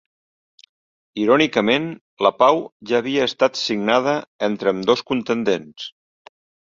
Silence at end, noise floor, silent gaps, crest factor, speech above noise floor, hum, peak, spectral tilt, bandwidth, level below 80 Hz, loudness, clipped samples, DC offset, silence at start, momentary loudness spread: 0.8 s; under -90 dBFS; 2.01-2.17 s, 2.72-2.80 s, 4.27-4.39 s; 20 dB; over 71 dB; none; 0 dBFS; -4.5 dB/octave; 7.6 kHz; -62 dBFS; -19 LUFS; under 0.1%; under 0.1%; 1.15 s; 9 LU